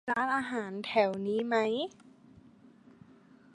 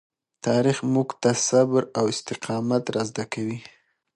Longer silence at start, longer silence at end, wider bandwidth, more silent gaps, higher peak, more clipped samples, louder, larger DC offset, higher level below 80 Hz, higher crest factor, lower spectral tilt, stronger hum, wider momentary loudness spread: second, 0.05 s vs 0.45 s; first, 1.65 s vs 0.5 s; about the same, 11 kHz vs 11 kHz; neither; second, -14 dBFS vs -6 dBFS; neither; second, -31 LUFS vs -24 LUFS; neither; second, -74 dBFS vs -66 dBFS; about the same, 20 dB vs 18 dB; about the same, -5.5 dB/octave vs -5 dB/octave; neither; second, 7 LU vs 10 LU